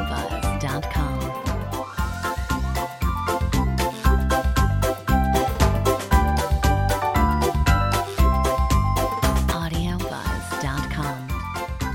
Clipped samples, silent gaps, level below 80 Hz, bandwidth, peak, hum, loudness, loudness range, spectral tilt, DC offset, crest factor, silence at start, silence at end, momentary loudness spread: under 0.1%; none; -26 dBFS; 17 kHz; -2 dBFS; none; -23 LUFS; 5 LU; -5.5 dB/octave; under 0.1%; 18 dB; 0 s; 0 s; 7 LU